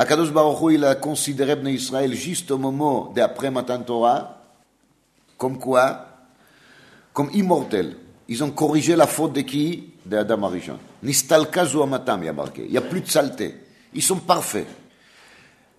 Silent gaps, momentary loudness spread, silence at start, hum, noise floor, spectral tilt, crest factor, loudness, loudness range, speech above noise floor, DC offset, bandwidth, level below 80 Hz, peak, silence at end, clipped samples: none; 13 LU; 0 s; none; -62 dBFS; -4.5 dB/octave; 22 dB; -21 LUFS; 4 LU; 42 dB; under 0.1%; 13.5 kHz; -64 dBFS; 0 dBFS; 1.05 s; under 0.1%